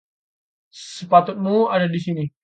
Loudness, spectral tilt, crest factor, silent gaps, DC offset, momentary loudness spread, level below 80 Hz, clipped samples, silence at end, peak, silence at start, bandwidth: -19 LUFS; -6.5 dB/octave; 20 dB; none; under 0.1%; 18 LU; -68 dBFS; under 0.1%; 0.15 s; 0 dBFS; 0.75 s; 9 kHz